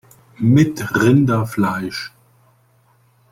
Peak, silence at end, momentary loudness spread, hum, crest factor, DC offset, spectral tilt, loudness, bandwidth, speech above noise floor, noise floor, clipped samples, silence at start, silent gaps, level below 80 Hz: -2 dBFS; 1.25 s; 13 LU; none; 16 dB; under 0.1%; -7 dB/octave; -17 LUFS; 16 kHz; 41 dB; -56 dBFS; under 0.1%; 0.4 s; none; -52 dBFS